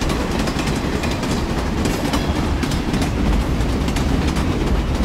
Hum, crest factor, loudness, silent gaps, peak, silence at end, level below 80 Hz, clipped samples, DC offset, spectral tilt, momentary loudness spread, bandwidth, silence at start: none; 14 dB; -20 LUFS; none; -4 dBFS; 0 s; -24 dBFS; under 0.1%; under 0.1%; -5.5 dB/octave; 2 LU; 16 kHz; 0 s